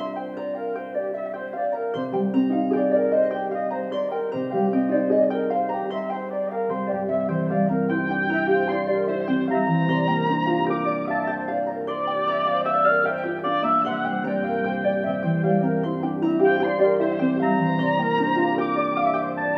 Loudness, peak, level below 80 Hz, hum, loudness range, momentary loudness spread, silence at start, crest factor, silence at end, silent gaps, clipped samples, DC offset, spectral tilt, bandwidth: -23 LUFS; -8 dBFS; -74 dBFS; none; 3 LU; 7 LU; 0 s; 16 dB; 0 s; none; under 0.1%; under 0.1%; -9.5 dB/octave; 6 kHz